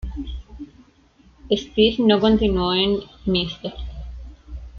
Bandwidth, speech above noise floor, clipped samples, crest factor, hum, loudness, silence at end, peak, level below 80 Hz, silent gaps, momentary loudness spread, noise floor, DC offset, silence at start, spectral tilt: 7 kHz; 35 dB; under 0.1%; 18 dB; none; -20 LUFS; 0 s; -4 dBFS; -36 dBFS; none; 23 LU; -54 dBFS; under 0.1%; 0 s; -6.5 dB/octave